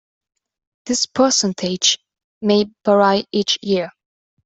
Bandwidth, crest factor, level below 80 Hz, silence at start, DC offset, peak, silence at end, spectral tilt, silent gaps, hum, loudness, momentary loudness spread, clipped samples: 8.4 kHz; 18 dB; -60 dBFS; 0.85 s; under 0.1%; -2 dBFS; 0.55 s; -3 dB/octave; 2.24-2.41 s; none; -17 LUFS; 9 LU; under 0.1%